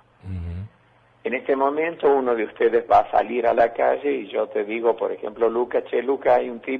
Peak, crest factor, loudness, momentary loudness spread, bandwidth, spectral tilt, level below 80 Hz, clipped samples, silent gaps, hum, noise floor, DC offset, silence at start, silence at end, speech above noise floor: -4 dBFS; 18 dB; -21 LUFS; 14 LU; 5 kHz; -8 dB/octave; -52 dBFS; under 0.1%; none; none; -57 dBFS; under 0.1%; 0.25 s; 0 s; 36 dB